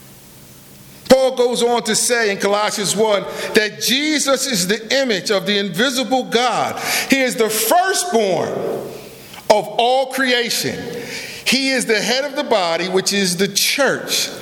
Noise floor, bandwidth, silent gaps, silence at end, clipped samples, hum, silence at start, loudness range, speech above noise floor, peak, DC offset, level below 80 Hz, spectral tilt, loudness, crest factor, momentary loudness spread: -41 dBFS; 19.5 kHz; none; 0 s; under 0.1%; none; 0 s; 2 LU; 24 dB; 0 dBFS; under 0.1%; -56 dBFS; -2.5 dB/octave; -16 LUFS; 18 dB; 7 LU